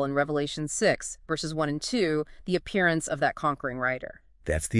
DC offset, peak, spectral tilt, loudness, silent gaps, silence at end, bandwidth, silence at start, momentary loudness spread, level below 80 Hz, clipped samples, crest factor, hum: under 0.1%; -10 dBFS; -4.5 dB/octave; -28 LUFS; none; 0 s; 12 kHz; 0 s; 7 LU; -48 dBFS; under 0.1%; 18 dB; none